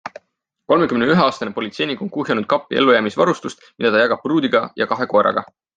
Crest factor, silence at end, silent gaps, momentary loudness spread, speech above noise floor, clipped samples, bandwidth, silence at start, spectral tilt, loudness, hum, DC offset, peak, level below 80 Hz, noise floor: 16 dB; 0.35 s; none; 10 LU; 49 dB; under 0.1%; 9.2 kHz; 0.05 s; -6 dB/octave; -18 LUFS; none; under 0.1%; -2 dBFS; -60 dBFS; -67 dBFS